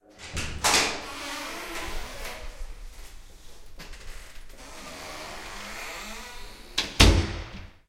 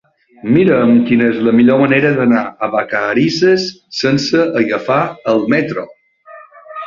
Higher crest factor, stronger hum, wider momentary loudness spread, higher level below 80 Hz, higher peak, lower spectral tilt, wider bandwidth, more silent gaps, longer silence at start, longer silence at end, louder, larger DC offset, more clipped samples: first, 28 dB vs 12 dB; neither; first, 26 LU vs 9 LU; first, -34 dBFS vs -54 dBFS; about the same, -2 dBFS vs -2 dBFS; second, -3 dB/octave vs -6 dB/octave; first, 16 kHz vs 7.4 kHz; neither; second, 0.1 s vs 0.45 s; about the same, 0.1 s vs 0 s; second, -27 LUFS vs -13 LUFS; neither; neither